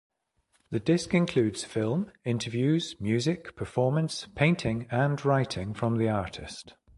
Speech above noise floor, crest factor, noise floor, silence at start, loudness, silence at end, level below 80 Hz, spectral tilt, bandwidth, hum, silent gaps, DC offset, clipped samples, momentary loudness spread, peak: 45 dB; 20 dB; -72 dBFS; 0.7 s; -28 LUFS; 0.3 s; -54 dBFS; -6 dB/octave; 11.5 kHz; none; none; under 0.1%; under 0.1%; 8 LU; -8 dBFS